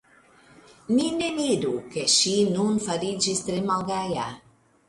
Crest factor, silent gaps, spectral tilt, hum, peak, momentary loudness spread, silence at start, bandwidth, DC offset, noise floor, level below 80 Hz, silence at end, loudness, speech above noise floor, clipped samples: 18 dB; none; -3.5 dB/octave; none; -8 dBFS; 9 LU; 0.9 s; 11.5 kHz; under 0.1%; -56 dBFS; -60 dBFS; 0.5 s; -24 LUFS; 31 dB; under 0.1%